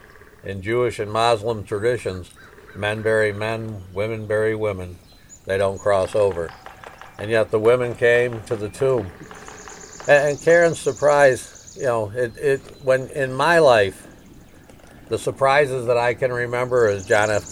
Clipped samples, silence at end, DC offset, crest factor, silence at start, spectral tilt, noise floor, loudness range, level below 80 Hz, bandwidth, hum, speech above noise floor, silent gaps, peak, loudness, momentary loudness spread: under 0.1%; 0 s; under 0.1%; 20 dB; 0.45 s; -5 dB/octave; -45 dBFS; 5 LU; -50 dBFS; 14.5 kHz; none; 26 dB; none; -2 dBFS; -20 LUFS; 19 LU